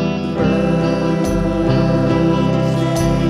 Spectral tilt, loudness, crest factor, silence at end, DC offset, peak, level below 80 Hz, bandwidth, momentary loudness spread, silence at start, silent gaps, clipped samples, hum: -7.5 dB/octave; -16 LUFS; 14 dB; 0 s; under 0.1%; -2 dBFS; -30 dBFS; 12.5 kHz; 2 LU; 0 s; none; under 0.1%; none